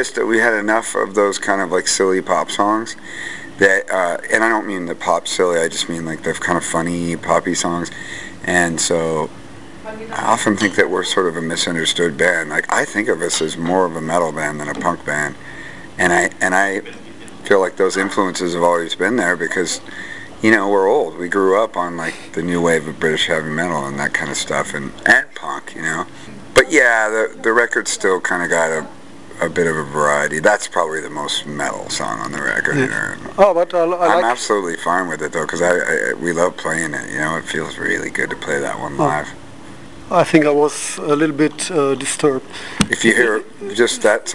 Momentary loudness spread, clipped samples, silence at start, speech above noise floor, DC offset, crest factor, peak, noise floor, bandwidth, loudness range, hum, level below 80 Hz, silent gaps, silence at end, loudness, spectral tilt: 11 LU; under 0.1%; 0 s; 20 dB; 1%; 18 dB; 0 dBFS; -37 dBFS; 12 kHz; 3 LU; none; -52 dBFS; none; 0 s; -17 LUFS; -3.5 dB/octave